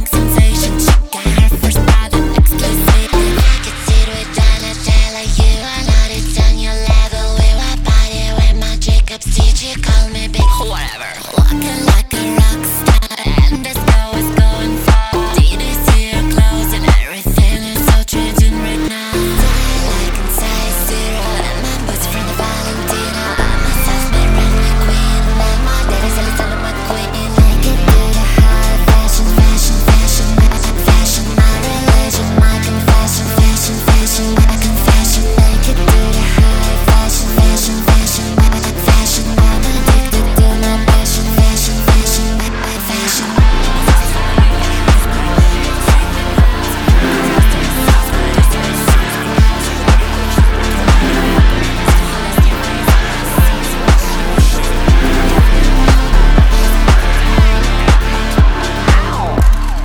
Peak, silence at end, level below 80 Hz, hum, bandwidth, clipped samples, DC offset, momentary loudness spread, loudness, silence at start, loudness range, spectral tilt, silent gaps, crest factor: 0 dBFS; 0 s; -12 dBFS; none; 19 kHz; under 0.1%; under 0.1%; 5 LU; -13 LUFS; 0 s; 3 LU; -4.5 dB/octave; none; 10 dB